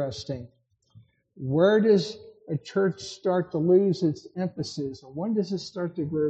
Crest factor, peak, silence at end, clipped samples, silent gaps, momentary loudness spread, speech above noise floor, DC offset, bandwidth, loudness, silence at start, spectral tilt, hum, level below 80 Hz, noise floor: 16 dB; -10 dBFS; 0 s; under 0.1%; none; 14 LU; 31 dB; under 0.1%; 8.4 kHz; -26 LUFS; 0 s; -7 dB/octave; none; -66 dBFS; -57 dBFS